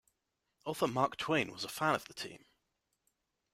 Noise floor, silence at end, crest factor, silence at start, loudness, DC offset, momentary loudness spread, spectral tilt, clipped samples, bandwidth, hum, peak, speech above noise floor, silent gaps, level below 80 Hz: -85 dBFS; 1.15 s; 22 dB; 0.65 s; -35 LUFS; under 0.1%; 13 LU; -4.5 dB/octave; under 0.1%; 16 kHz; none; -16 dBFS; 49 dB; none; -72 dBFS